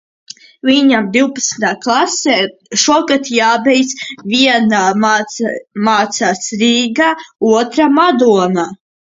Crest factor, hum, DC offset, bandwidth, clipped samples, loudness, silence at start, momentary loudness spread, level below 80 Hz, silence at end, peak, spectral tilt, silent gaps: 12 dB; none; under 0.1%; 7.8 kHz; under 0.1%; -12 LUFS; 0.65 s; 7 LU; -58 dBFS; 0.45 s; 0 dBFS; -3 dB/octave; none